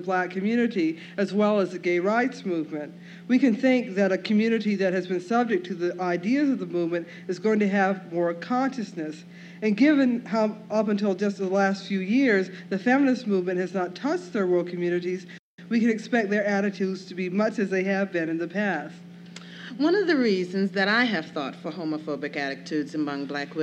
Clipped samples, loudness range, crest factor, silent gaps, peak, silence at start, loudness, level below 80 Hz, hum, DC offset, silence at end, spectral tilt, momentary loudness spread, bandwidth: under 0.1%; 2 LU; 16 dB; 15.39-15.58 s; -10 dBFS; 0 s; -25 LUFS; -82 dBFS; none; under 0.1%; 0 s; -6.5 dB/octave; 11 LU; 8.6 kHz